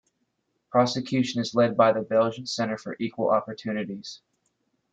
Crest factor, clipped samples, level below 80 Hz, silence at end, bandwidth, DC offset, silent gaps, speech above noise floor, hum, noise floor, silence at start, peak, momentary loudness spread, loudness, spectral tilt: 20 dB; under 0.1%; -68 dBFS; 0.75 s; 9 kHz; under 0.1%; none; 50 dB; none; -75 dBFS; 0.75 s; -6 dBFS; 11 LU; -25 LUFS; -5.5 dB/octave